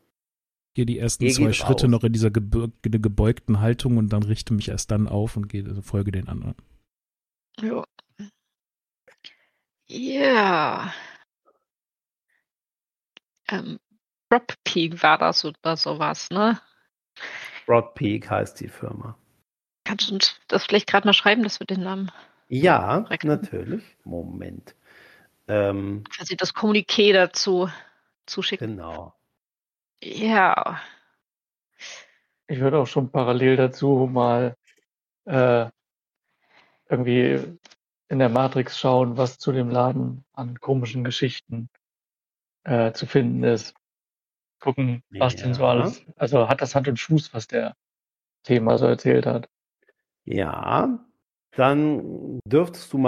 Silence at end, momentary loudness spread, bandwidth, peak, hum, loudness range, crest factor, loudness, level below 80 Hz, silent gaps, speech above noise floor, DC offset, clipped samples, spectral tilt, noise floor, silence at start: 0 s; 16 LU; 13.5 kHz; -2 dBFS; none; 7 LU; 22 dB; -22 LUFS; -46 dBFS; none; over 68 dB; under 0.1%; under 0.1%; -5.5 dB/octave; under -90 dBFS; 0.75 s